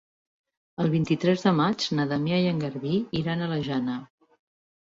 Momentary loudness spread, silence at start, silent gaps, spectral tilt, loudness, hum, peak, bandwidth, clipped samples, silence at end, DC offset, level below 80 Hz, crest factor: 7 LU; 0.8 s; none; -6.5 dB/octave; -26 LUFS; none; -10 dBFS; 7.8 kHz; under 0.1%; 0.9 s; under 0.1%; -60 dBFS; 18 dB